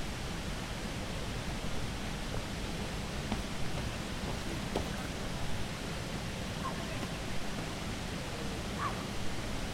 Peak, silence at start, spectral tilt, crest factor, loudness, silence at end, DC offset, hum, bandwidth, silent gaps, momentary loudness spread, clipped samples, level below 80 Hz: -18 dBFS; 0 s; -4.5 dB/octave; 18 dB; -38 LUFS; 0 s; under 0.1%; none; 16 kHz; none; 2 LU; under 0.1%; -44 dBFS